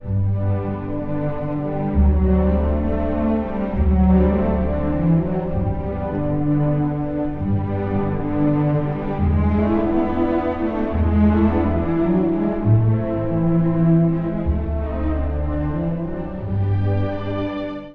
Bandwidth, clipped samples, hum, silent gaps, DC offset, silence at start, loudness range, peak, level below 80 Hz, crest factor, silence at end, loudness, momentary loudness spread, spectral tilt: 4.3 kHz; under 0.1%; none; none; under 0.1%; 0 s; 3 LU; -4 dBFS; -26 dBFS; 14 dB; 0 s; -20 LUFS; 8 LU; -11.5 dB/octave